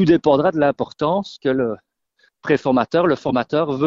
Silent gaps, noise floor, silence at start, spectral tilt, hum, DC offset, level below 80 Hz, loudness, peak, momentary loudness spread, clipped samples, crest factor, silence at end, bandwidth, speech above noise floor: none; -62 dBFS; 0 s; -7.5 dB/octave; none; under 0.1%; -52 dBFS; -19 LUFS; -2 dBFS; 7 LU; under 0.1%; 18 dB; 0 s; 7.4 kHz; 44 dB